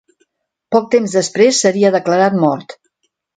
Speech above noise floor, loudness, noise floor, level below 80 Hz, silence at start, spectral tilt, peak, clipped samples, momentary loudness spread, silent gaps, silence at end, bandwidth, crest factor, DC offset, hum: 55 dB; -14 LUFS; -68 dBFS; -64 dBFS; 0.7 s; -4.5 dB/octave; 0 dBFS; under 0.1%; 6 LU; none; 0.65 s; 9.6 kHz; 14 dB; under 0.1%; none